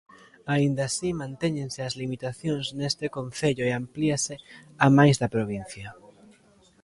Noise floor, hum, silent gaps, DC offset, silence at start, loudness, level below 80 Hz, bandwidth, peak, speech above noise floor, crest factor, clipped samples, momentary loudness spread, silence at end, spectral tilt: -59 dBFS; none; none; under 0.1%; 0.45 s; -26 LUFS; -58 dBFS; 11.5 kHz; -4 dBFS; 33 dB; 22 dB; under 0.1%; 13 LU; 0.9 s; -5.5 dB/octave